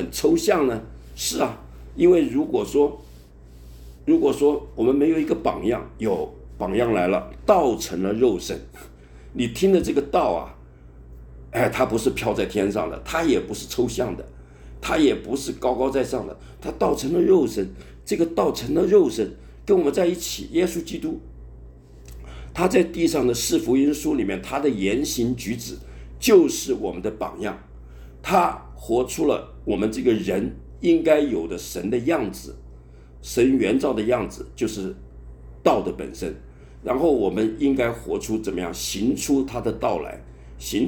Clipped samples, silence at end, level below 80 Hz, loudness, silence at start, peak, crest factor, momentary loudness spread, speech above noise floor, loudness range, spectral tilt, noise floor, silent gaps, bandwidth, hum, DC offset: under 0.1%; 0 s; -42 dBFS; -22 LUFS; 0 s; -4 dBFS; 20 dB; 14 LU; 23 dB; 3 LU; -5 dB/octave; -45 dBFS; none; 17.5 kHz; none; under 0.1%